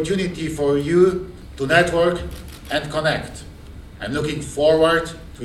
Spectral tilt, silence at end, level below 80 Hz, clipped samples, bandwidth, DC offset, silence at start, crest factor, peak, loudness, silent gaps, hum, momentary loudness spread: -5.5 dB/octave; 0 s; -40 dBFS; under 0.1%; 14 kHz; under 0.1%; 0 s; 18 dB; -2 dBFS; -20 LUFS; none; none; 18 LU